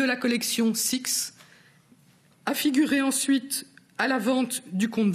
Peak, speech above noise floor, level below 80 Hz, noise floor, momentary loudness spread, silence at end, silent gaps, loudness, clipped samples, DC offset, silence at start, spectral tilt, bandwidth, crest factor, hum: -8 dBFS; 34 dB; -74 dBFS; -59 dBFS; 9 LU; 0 s; none; -25 LUFS; under 0.1%; under 0.1%; 0 s; -3 dB/octave; 15.5 kHz; 18 dB; none